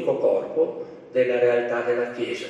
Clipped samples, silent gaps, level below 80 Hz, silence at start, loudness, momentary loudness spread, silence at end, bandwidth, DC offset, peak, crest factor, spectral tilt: under 0.1%; none; -74 dBFS; 0 s; -23 LUFS; 7 LU; 0 s; 8.8 kHz; under 0.1%; -8 dBFS; 14 dB; -5.5 dB/octave